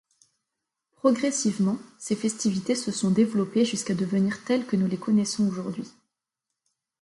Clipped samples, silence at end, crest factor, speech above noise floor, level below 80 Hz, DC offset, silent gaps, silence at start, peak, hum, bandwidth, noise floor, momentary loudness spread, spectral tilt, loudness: under 0.1%; 1.1 s; 18 dB; 61 dB; -68 dBFS; under 0.1%; none; 1.05 s; -8 dBFS; none; 11.5 kHz; -86 dBFS; 8 LU; -5 dB/octave; -26 LUFS